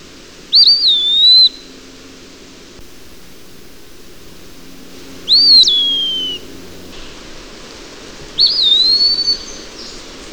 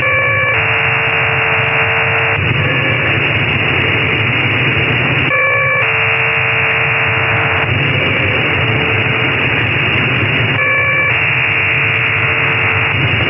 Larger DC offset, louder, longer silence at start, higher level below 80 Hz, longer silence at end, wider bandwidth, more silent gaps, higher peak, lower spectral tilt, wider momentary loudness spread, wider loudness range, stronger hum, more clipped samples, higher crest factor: first, 0.6% vs under 0.1%; first, -8 LUFS vs -11 LUFS; first, 0.5 s vs 0 s; about the same, -44 dBFS vs -40 dBFS; about the same, 0 s vs 0 s; first, over 20 kHz vs 5.6 kHz; neither; first, 0 dBFS vs -4 dBFS; second, -0.5 dB/octave vs -8 dB/octave; first, 24 LU vs 1 LU; first, 4 LU vs 1 LU; neither; neither; about the same, 14 dB vs 10 dB